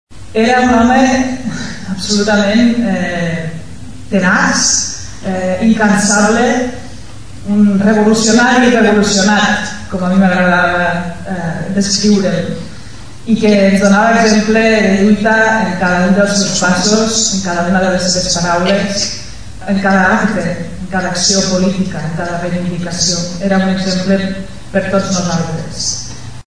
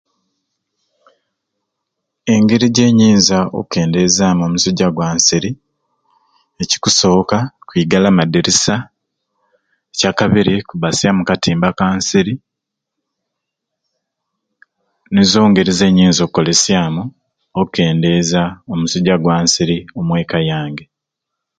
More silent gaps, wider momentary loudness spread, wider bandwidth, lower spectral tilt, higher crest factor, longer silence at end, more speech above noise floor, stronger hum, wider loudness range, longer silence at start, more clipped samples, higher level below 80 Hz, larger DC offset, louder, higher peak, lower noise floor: neither; about the same, 12 LU vs 10 LU; first, 11 kHz vs 9.4 kHz; about the same, -4 dB/octave vs -4.5 dB/octave; about the same, 12 dB vs 16 dB; second, 0 s vs 0.75 s; second, 20 dB vs 66 dB; neither; about the same, 5 LU vs 5 LU; second, 0.05 s vs 2.25 s; neither; first, -38 dBFS vs -44 dBFS; first, 4% vs under 0.1%; about the same, -12 LUFS vs -13 LUFS; about the same, 0 dBFS vs 0 dBFS; second, -32 dBFS vs -79 dBFS